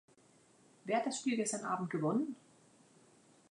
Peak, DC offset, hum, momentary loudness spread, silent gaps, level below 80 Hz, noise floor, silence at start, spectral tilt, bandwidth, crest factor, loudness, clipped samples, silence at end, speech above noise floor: -22 dBFS; under 0.1%; none; 10 LU; none; -88 dBFS; -67 dBFS; 0.85 s; -4.5 dB/octave; 11 kHz; 16 dB; -36 LUFS; under 0.1%; 1.15 s; 31 dB